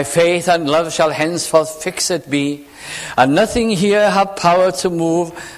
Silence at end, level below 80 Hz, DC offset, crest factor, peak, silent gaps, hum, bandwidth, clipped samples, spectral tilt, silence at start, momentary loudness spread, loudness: 0 s; -46 dBFS; under 0.1%; 16 dB; 0 dBFS; none; none; 15.5 kHz; under 0.1%; -4 dB/octave; 0 s; 8 LU; -15 LUFS